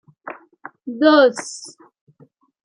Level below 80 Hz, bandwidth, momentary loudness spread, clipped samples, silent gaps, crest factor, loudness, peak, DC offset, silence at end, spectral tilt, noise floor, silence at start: -78 dBFS; 10.5 kHz; 24 LU; under 0.1%; none; 18 dB; -15 LUFS; -2 dBFS; under 0.1%; 1 s; -3 dB/octave; -54 dBFS; 0.25 s